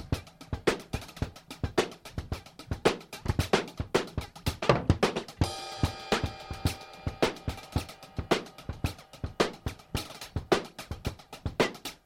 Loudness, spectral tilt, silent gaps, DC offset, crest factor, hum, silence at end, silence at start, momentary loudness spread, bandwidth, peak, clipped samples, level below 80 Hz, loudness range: -32 LUFS; -5 dB/octave; none; under 0.1%; 24 dB; none; 0.1 s; 0 s; 12 LU; 16.5 kHz; -8 dBFS; under 0.1%; -44 dBFS; 4 LU